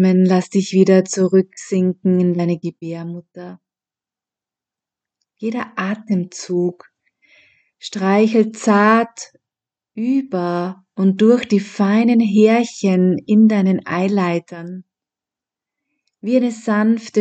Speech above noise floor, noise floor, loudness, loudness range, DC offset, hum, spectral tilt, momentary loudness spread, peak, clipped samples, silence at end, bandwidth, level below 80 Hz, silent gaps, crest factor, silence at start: 74 dB; -90 dBFS; -17 LUFS; 11 LU; under 0.1%; none; -6.5 dB/octave; 17 LU; 0 dBFS; under 0.1%; 0 s; 8.8 kHz; -72 dBFS; none; 18 dB; 0 s